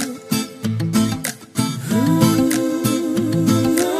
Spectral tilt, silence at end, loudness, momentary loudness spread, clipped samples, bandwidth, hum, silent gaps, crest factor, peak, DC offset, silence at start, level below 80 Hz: -5.5 dB/octave; 0 s; -19 LUFS; 8 LU; under 0.1%; 15.5 kHz; none; none; 18 dB; 0 dBFS; under 0.1%; 0 s; -50 dBFS